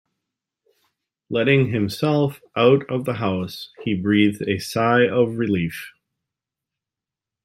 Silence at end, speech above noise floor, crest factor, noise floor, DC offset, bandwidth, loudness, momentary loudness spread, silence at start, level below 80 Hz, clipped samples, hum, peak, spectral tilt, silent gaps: 1.55 s; 68 dB; 18 dB; -88 dBFS; under 0.1%; 16 kHz; -20 LUFS; 10 LU; 1.3 s; -60 dBFS; under 0.1%; none; -4 dBFS; -6.5 dB/octave; none